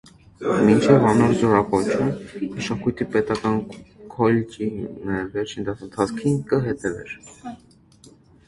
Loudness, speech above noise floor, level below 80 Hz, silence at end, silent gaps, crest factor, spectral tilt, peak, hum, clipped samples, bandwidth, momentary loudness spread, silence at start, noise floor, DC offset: -21 LUFS; 30 dB; -50 dBFS; 0.9 s; none; 20 dB; -7 dB/octave; -2 dBFS; none; under 0.1%; 11.5 kHz; 19 LU; 0.4 s; -51 dBFS; under 0.1%